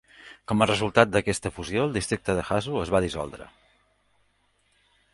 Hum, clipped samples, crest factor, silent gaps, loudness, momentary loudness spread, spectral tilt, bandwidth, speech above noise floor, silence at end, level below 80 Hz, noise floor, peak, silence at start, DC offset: 50 Hz at -50 dBFS; under 0.1%; 26 dB; none; -25 LUFS; 13 LU; -5 dB/octave; 11.5 kHz; 43 dB; 1.65 s; -48 dBFS; -68 dBFS; -2 dBFS; 0.2 s; under 0.1%